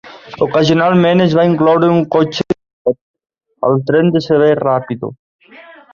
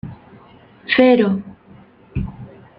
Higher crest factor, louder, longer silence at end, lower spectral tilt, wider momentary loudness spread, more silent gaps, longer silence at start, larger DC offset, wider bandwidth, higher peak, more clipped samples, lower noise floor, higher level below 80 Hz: second, 12 dB vs 18 dB; first, -13 LUFS vs -17 LUFS; about the same, 0.3 s vs 0.3 s; second, -7.5 dB/octave vs -9 dB/octave; second, 11 LU vs 25 LU; first, 2.73-2.85 s, 3.01-3.14 s, 5.19-5.39 s vs none; about the same, 0.05 s vs 0.05 s; neither; first, 7.2 kHz vs 5.2 kHz; about the same, -2 dBFS vs -2 dBFS; neither; second, -40 dBFS vs -46 dBFS; second, -52 dBFS vs -42 dBFS